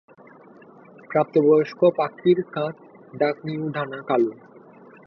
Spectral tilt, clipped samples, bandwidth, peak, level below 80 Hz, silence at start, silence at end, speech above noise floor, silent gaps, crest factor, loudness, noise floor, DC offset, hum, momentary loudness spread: -9 dB/octave; under 0.1%; 6 kHz; -6 dBFS; -70 dBFS; 1.1 s; 0.7 s; 27 dB; none; 18 dB; -22 LUFS; -48 dBFS; under 0.1%; none; 11 LU